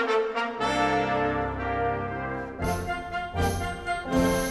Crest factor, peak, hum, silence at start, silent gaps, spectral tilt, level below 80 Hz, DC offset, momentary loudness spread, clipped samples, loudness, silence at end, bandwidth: 16 dB; -12 dBFS; none; 0 s; none; -5 dB/octave; -42 dBFS; under 0.1%; 7 LU; under 0.1%; -28 LUFS; 0 s; 15.5 kHz